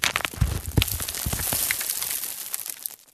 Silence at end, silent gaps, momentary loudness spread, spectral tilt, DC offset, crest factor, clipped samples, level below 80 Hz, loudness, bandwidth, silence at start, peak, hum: 0.1 s; none; 7 LU; -2.5 dB/octave; under 0.1%; 26 dB; under 0.1%; -36 dBFS; -26 LUFS; 14.5 kHz; 0 s; 0 dBFS; none